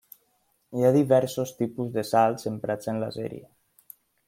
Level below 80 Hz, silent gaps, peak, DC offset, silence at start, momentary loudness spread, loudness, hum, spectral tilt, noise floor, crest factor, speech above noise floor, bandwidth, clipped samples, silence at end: -68 dBFS; none; -8 dBFS; under 0.1%; 0.7 s; 14 LU; -25 LUFS; none; -6.5 dB/octave; -70 dBFS; 20 dB; 45 dB; 16.5 kHz; under 0.1%; 0.85 s